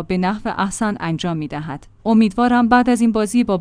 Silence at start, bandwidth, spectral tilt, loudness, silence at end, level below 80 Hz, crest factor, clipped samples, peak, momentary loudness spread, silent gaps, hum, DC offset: 0 s; 10.5 kHz; -6 dB/octave; -17 LUFS; 0 s; -44 dBFS; 14 dB; under 0.1%; -2 dBFS; 12 LU; none; none; under 0.1%